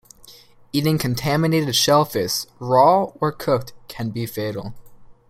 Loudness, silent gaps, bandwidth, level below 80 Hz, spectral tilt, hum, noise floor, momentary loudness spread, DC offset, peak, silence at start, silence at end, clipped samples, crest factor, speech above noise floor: -20 LUFS; none; 16.5 kHz; -52 dBFS; -5 dB/octave; none; -47 dBFS; 13 LU; under 0.1%; -2 dBFS; 0.3 s; 0.15 s; under 0.1%; 18 dB; 27 dB